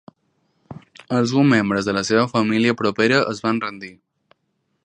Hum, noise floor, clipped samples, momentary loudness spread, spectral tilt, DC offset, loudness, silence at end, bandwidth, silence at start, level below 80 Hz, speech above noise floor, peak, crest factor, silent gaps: none; -71 dBFS; under 0.1%; 19 LU; -5.5 dB/octave; under 0.1%; -19 LUFS; 0.95 s; 10 kHz; 0.7 s; -58 dBFS; 52 dB; -2 dBFS; 18 dB; none